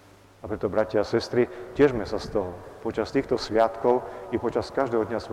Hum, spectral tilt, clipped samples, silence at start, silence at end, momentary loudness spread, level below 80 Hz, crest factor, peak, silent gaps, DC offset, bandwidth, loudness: none; -6.5 dB/octave; under 0.1%; 0.45 s; 0 s; 10 LU; -50 dBFS; 18 dB; -8 dBFS; none; under 0.1%; 12 kHz; -26 LUFS